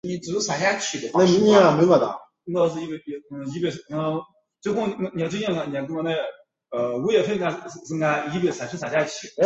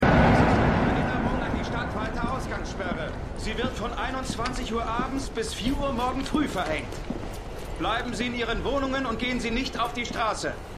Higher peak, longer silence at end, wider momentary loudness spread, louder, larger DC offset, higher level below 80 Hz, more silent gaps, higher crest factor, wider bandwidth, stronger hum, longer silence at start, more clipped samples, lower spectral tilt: first, -4 dBFS vs -8 dBFS; about the same, 0 s vs 0 s; first, 16 LU vs 10 LU; first, -23 LUFS vs -27 LUFS; neither; second, -62 dBFS vs -36 dBFS; neither; about the same, 20 dB vs 18 dB; second, 8 kHz vs 14.5 kHz; neither; about the same, 0.05 s vs 0 s; neither; about the same, -5 dB/octave vs -5.5 dB/octave